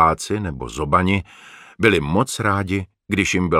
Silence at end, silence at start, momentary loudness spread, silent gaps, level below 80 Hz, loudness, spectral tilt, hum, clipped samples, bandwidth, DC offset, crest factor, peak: 0 s; 0 s; 9 LU; none; -40 dBFS; -20 LUFS; -5 dB/octave; none; under 0.1%; 15 kHz; under 0.1%; 18 dB; 0 dBFS